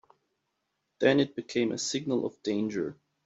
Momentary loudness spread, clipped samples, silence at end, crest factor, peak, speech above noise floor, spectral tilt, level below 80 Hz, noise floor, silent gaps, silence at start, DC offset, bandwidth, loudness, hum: 8 LU; under 0.1%; 0.35 s; 22 dB; -8 dBFS; 52 dB; -4.5 dB/octave; -72 dBFS; -81 dBFS; none; 1 s; under 0.1%; 8.2 kHz; -29 LUFS; none